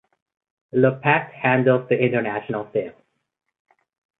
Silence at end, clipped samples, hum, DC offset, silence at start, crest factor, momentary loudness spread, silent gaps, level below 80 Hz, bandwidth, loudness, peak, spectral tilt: 1.3 s; under 0.1%; none; under 0.1%; 0.75 s; 20 dB; 10 LU; none; -66 dBFS; 4 kHz; -21 LUFS; -2 dBFS; -11 dB/octave